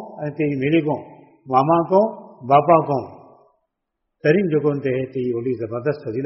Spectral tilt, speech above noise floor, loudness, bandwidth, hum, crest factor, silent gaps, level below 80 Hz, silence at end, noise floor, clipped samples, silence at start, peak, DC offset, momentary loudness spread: -6.5 dB/octave; 59 dB; -20 LUFS; 5.8 kHz; none; 18 dB; none; -60 dBFS; 0 s; -78 dBFS; under 0.1%; 0 s; -2 dBFS; under 0.1%; 9 LU